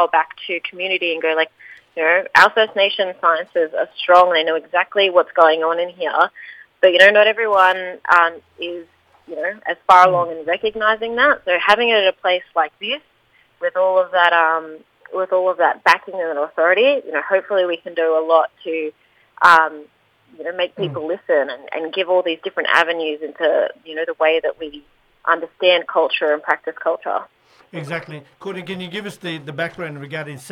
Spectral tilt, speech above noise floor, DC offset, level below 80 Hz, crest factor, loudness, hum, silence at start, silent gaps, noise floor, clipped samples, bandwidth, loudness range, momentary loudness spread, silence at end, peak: -4 dB/octave; 40 dB; under 0.1%; -64 dBFS; 18 dB; -17 LUFS; none; 0 s; none; -57 dBFS; under 0.1%; 13.5 kHz; 5 LU; 16 LU; 0 s; 0 dBFS